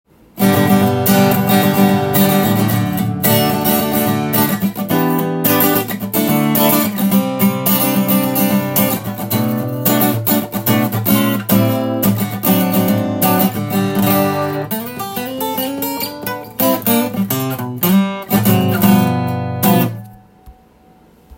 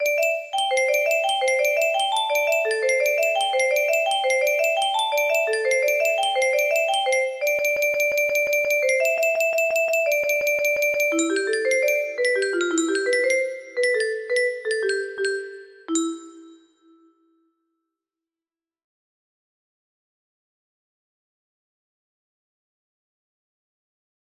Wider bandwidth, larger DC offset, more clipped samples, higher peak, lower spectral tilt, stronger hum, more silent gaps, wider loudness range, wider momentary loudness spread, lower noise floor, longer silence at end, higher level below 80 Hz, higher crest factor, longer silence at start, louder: about the same, 17 kHz vs 15.5 kHz; neither; neither; first, 0 dBFS vs -8 dBFS; first, -5.5 dB/octave vs 0 dB/octave; neither; neither; second, 4 LU vs 8 LU; about the same, 7 LU vs 5 LU; second, -47 dBFS vs under -90 dBFS; second, 0.05 s vs 7.75 s; first, -52 dBFS vs -72 dBFS; about the same, 14 dB vs 14 dB; first, 0.35 s vs 0 s; first, -15 LUFS vs -21 LUFS